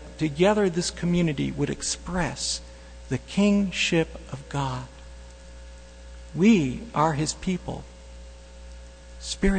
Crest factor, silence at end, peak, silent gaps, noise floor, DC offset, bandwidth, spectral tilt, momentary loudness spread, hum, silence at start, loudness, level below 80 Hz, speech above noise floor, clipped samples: 20 dB; 0 s; -6 dBFS; none; -44 dBFS; under 0.1%; 9.4 kHz; -5 dB/octave; 24 LU; 60 Hz at -45 dBFS; 0 s; -25 LUFS; -40 dBFS; 19 dB; under 0.1%